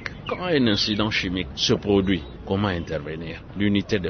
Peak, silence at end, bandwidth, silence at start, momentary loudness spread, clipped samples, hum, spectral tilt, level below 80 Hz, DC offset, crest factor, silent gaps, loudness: -6 dBFS; 0 s; 6.6 kHz; 0 s; 10 LU; under 0.1%; none; -5 dB/octave; -42 dBFS; under 0.1%; 16 dB; none; -23 LUFS